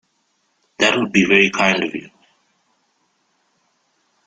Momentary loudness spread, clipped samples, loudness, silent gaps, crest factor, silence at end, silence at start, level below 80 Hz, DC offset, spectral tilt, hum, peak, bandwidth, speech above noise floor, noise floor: 11 LU; under 0.1%; -15 LUFS; none; 20 dB; 2.2 s; 0.8 s; -58 dBFS; under 0.1%; -4 dB/octave; none; 0 dBFS; 9.4 kHz; 50 dB; -66 dBFS